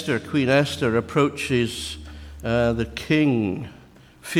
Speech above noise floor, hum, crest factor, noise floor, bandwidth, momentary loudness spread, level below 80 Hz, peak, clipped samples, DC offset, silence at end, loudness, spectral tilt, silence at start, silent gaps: 24 dB; none; 16 dB; -45 dBFS; 16 kHz; 15 LU; -44 dBFS; -6 dBFS; under 0.1%; under 0.1%; 0 s; -22 LUFS; -6 dB/octave; 0 s; none